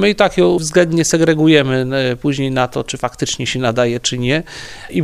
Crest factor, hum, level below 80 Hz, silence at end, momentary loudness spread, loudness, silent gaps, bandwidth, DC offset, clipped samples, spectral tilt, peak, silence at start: 14 dB; none; -42 dBFS; 0 s; 9 LU; -15 LUFS; none; 15 kHz; under 0.1%; under 0.1%; -4.5 dB/octave; 0 dBFS; 0 s